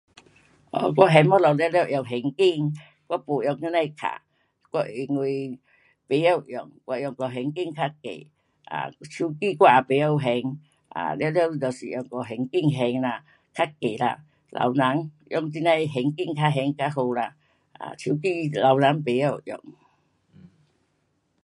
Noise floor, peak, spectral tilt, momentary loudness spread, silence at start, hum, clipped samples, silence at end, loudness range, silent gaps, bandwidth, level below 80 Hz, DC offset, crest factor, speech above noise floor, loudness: -71 dBFS; 0 dBFS; -7 dB/octave; 17 LU; 0.75 s; none; under 0.1%; 1.7 s; 6 LU; none; 11.5 kHz; -70 dBFS; under 0.1%; 24 dB; 47 dB; -24 LUFS